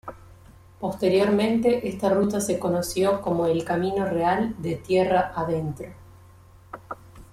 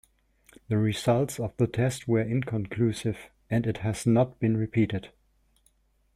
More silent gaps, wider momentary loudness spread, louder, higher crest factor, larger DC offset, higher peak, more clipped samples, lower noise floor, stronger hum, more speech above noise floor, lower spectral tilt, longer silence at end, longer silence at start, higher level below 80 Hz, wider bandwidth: neither; first, 18 LU vs 7 LU; first, -24 LUFS vs -27 LUFS; about the same, 16 dB vs 18 dB; neither; about the same, -8 dBFS vs -10 dBFS; neither; second, -50 dBFS vs -67 dBFS; neither; second, 27 dB vs 41 dB; about the same, -6 dB/octave vs -7 dB/octave; second, 0.1 s vs 1.05 s; second, 0.05 s vs 0.7 s; about the same, -52 dBFS vs -56 dBFS; about the same, 15.5 kHz vs 14.5 kHz